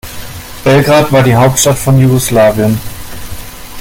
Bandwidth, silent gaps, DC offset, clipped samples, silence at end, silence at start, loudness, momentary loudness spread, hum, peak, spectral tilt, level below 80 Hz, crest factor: 17 kHz; none; under 0.1%; under 0.1%; 0 s; 0.05 s; -9 LUFS; 19 LU; none; 0 dBFS; -5 dB/octave; -32 dBFS; 10 dB